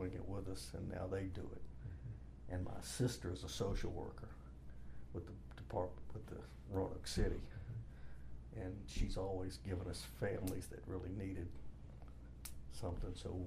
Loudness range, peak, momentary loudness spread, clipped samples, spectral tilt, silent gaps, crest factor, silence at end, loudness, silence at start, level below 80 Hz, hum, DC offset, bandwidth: 2 LU; -24 dBFS; 15 LU; under 0.1%; -6 dB/octave; none; 20 dB; 0 s; -46 LUFS; 0 s; -50 dBFS; none; under 0.1%; 15.5 kHz